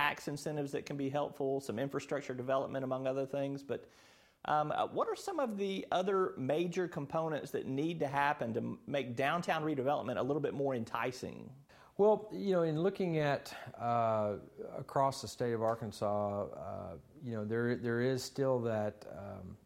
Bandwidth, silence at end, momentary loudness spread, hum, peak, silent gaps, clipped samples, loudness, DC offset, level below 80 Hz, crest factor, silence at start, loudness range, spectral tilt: 16.5 kHz; 0.1 s; 11 LU; none; -16 dBFS; none; under 0.1%; -36 LUFS; under 0.1%; -72 dBFS; 20 dB; 0 s; 3 LU; -6 dB/octave